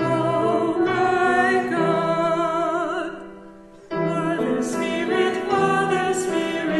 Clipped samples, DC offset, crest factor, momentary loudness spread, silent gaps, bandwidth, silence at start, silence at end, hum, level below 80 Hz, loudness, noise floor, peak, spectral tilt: under 0.1%; under 0.1%; 14 dB; 7 LU; none; 12 kHz; 0 s; 0 s; none; -56 dBFS; -21 LUFS; -44 dBFS; -8 dBFS; -5.5 dB/octave